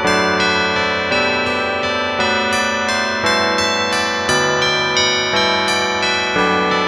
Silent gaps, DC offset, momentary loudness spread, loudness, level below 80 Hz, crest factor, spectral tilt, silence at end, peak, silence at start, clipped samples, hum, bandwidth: none; under 0.1%; 3 LU; -15 LUFS; -46 dBFS; 16 dB; -2.5 dB/octave; 0 s; 0 dBFS; 0 s; under 0.1%; none; 15.5 kHz